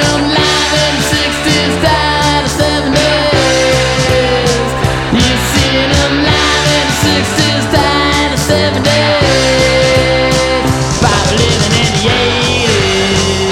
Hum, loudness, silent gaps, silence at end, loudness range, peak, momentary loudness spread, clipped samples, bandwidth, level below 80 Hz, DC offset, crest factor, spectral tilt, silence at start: none; -10 LUFS; none; 0 s; 1 LU; 0 dBFS; 2 LU; under 0.1%; 17.5 kHz; -24 dBFS; under 0.1%; 10 dB; -4 dB/octave; 0 s